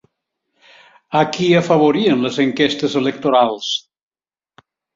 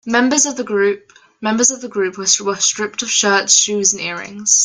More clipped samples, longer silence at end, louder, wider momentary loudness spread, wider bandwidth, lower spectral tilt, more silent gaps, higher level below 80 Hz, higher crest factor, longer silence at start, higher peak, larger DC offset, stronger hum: neither; first, 1.15 s vs 0 s; about the same, -16 LUFS vs -15 LUFS; about the same, 8 LU vs 10 LU; second, 7.8 kHz vs 10.5 kHz; first, -5.5 dB/octave vs -1 dB/octave; neither; about the same, -60 dBFS vs -62 dBFS; about the same, 16 dB vs 16 dB; first, 1.1 s vs 0.05 s; about the same, -2 dBFS vs 0 dBFS; neither; neither